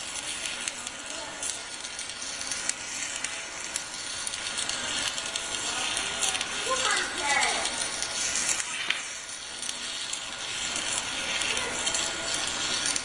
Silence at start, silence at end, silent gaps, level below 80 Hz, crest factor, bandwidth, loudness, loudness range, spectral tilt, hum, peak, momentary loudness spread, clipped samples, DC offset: 0 s; 0 s; none; -58 dBFS; 26 dB; 11.5 kHz; -29 LUFS; 6 LU; 0.5 dB/octave; none; -6 dBFS; 8 LU; under 0.1%; under 0.1%